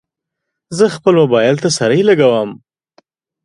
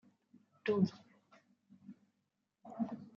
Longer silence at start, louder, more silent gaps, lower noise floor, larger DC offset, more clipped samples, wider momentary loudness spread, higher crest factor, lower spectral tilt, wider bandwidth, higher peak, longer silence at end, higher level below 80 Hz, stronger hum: about the same, 0.7 s vs 0.65 s; first, -12 LUFS vs -38 LUFS; neither; second, -78 dBFS vs -84 dBFS; neither; neither; second, 8 LU vs 26 LU; second, 14 dB vs 22 dB; second, -5 dB/octave vs -7 dB/octave; first, 11.5 kHz vs 7 kHz; first, 0 dBFS vs -20 dBFS; first, 0.9 s vs 0.05 s; first, -58 dBFS vs -88 dBFS; neither